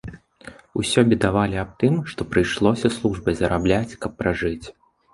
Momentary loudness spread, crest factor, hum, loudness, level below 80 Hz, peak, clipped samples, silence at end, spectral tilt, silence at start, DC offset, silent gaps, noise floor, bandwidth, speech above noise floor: 9 LU; 20 dB; none; -22 LUFS; -40 dBFS; -2 dBFS; under 0.1%; 0.45 s; -6 dB/octave; 0.05 s; under 0.1%; none; -45 dBFS; 11.5 kHz; 24 dB